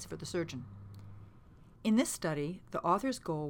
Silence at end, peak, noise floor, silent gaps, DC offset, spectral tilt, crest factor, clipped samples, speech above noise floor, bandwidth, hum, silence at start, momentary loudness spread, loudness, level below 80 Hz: 0 s; -18 dBFS; -57 dBFS; none; under 0.1%; -5 dB/octave; 18 dB; under 0.1%; 23 dB; 17.5 kHz; none; 0 s; 21 LU; -34 LUFS; -62 dBFS